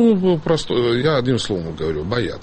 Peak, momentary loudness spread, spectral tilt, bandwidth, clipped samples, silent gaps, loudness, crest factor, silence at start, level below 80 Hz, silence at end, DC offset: -6 dBFS; 7 LU; -6.5 dB/octave; 8.8 kHz; under 0.1%; none; -19 LUFS; 14 dB; 0 s; -40 dBFS; 0 s; under 0.1%